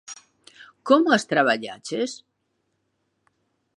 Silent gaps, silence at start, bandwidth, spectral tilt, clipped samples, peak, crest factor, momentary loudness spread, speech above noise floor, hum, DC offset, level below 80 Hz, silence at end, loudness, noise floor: none; 0.1 s; 11.5 kHz; -4 dB/octave; under 0.1%; -4 dBFS; 22 dB; 24 LU; 53 dB; none; under 0.1%; -78 dBFS; 1.6 s; -22 LUFS; -74 dBFS